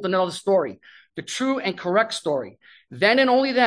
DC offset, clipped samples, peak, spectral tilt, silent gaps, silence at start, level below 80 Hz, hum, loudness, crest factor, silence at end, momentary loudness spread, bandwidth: under 0.1%; under 0.1%; -4 dBFS; -4 dB/octave; none; 0 s; -72 dBFS; none; -22 LUFS; 18 dB; 0 s; 15 LU; 10.5 kHz